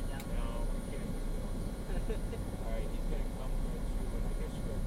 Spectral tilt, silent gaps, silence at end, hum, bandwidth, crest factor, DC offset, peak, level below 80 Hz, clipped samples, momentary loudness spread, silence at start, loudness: -6.5 dB/octave; none; 0 s; none; 14.5 kHz; 12 dB; under 0.1%; -22 dBFS; -36 dBFS; under 0.1%; 2 LU; 0 s; -40 LUFS